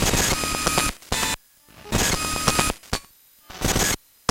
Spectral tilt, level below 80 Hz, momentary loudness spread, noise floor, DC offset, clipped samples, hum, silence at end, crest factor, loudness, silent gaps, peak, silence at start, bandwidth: -2.5 dB/octave; -34 dBFS; 10 LU; -52 dBFS; under 0.1%; under 0.1%; none; 0.35 s; 20 dB; -23 LUFS; none; -4 dBFS; 0 s; 17 kHz